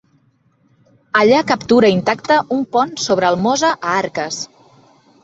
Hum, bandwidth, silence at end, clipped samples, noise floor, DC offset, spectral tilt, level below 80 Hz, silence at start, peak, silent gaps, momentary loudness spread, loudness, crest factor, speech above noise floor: none; 8.2 kHz; 0.8 s; under 0.1%; -58 dBFS; under 0.1%; -4 dB/octave; -56 dBFS; 1.15 s; -2 dBFS; none; 10 LU; -15 LUFS; 16 dB; 43 dB